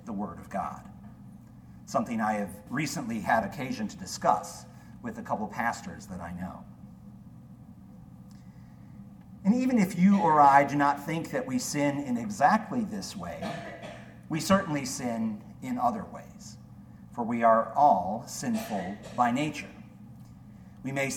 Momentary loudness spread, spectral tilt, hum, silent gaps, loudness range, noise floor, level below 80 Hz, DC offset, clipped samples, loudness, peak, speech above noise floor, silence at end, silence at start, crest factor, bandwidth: 26 LU; -5.5 dB/octave; none; none; 13 LU; -49 dBFS; -60 dBFS; under 0.1%; under 0.1%; -28 LUFS; -8 dBFS; 22 dB; 0 s; 0 s; 22 dB; 18 kHz